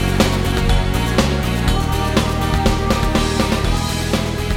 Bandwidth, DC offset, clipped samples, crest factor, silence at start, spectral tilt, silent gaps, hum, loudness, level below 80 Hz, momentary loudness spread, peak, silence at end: 17 kHz; under 0.1%; under 0.1%; 14 dB; 0 s; -5 dB/octave; none; none; -18 LUFS; -22 dBFS; 3 LU; -2 dBFS; 0 s